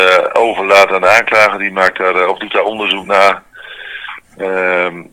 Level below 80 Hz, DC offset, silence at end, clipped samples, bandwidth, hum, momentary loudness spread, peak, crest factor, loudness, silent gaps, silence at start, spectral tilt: -54 dBFS; under 0.1%; 0.1 s; 1%; 20 kHz; none; 18 LU; 0 dBFS; 12 dB; -11 LUFS; none; 0 s; -3 dB/octave